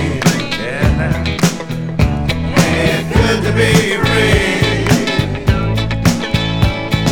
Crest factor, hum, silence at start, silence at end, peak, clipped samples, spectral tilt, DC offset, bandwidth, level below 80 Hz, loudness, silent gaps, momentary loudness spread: 14 dB; none; 0 s; 0 s; 0 dBFS; under 0.1%; -5 dB/octave; under 0.1%; 18.5 kHz; -24 dBFS; -14 LUFS; none; 5 LU